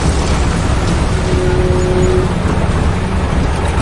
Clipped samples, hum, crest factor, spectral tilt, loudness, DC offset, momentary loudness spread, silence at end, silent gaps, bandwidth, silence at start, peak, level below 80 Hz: under 0.1%; none; 12 dB; -6 dB/octave; -15 LUFS; under 0.1%; 3 LU; 0 s; none; 11.5 kHz; 0 s; 0 dBFS; -18 dBFS